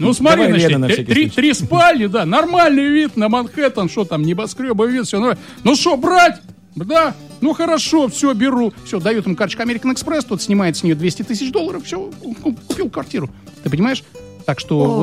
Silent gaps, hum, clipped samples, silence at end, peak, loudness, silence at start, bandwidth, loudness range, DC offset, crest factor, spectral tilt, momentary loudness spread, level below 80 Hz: none; none; under 0.1%; 0 s; -2 dBFS; -16 LUFS; 0 s; 15 kHz; 7 LU; 0.2%; 14 dB; -5 dB/octave; 12 LU; -50 dBFS